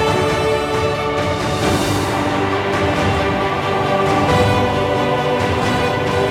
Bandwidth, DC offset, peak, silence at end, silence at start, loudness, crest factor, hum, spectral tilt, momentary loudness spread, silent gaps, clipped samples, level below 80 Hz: 16.5 kHz; under 0.1%; -2 dBFS; 0 s; 0 s; -17 LUFS; 14 dB; none; -5.5 dB/octave; 3 LU; none; under 0.1%; -36 dBFS